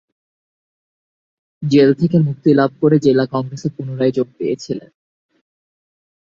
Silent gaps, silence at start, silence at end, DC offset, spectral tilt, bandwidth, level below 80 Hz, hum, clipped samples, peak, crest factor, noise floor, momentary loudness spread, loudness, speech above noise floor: none; 1.6 s; 1.5 s; under 0.1%; -8 dB/octave; 7.6 kHz; -58 dBFS; none; under 0.1%; -2 dBFS; 16 dB; under -90 dBFS; 12 LU; -16 LUFS; over 75 dB